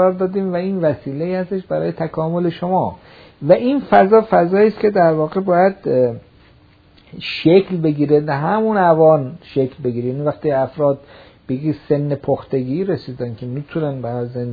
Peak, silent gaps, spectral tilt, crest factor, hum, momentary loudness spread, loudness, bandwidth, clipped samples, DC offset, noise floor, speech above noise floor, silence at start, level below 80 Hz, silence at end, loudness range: 0 dBFS; none; -10 dB/octave; 16 dB; none; 11 LU; -17 LUFS; 5 kHz; under 0.1%; under 0.1%; -49 dBFS; 33 dB; 0 s; -52 dBFS; 0 s; 6 LU